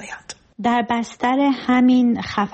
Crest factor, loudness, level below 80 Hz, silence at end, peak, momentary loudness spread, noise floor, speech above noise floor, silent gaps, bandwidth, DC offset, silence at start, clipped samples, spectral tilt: 12 dB; -18 LUFS; -54 dBFS; 0.05 s; -8 dBFS; 17 LU; -38 dBFS; 20 dB; none; 8.4 kHz; under 0.1%; 0 s; under 0.1%; -5 dB/octave